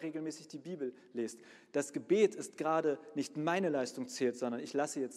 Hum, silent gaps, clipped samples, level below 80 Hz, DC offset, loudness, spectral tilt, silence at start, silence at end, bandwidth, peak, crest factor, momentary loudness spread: none; none; under 0.1%; -88 dBFS; under 0.1%; -36 LUFS; -5 dB/octave; 0 s; 0 s; 13.5 kHz; -18 dBFS; 18 dB; 11 LU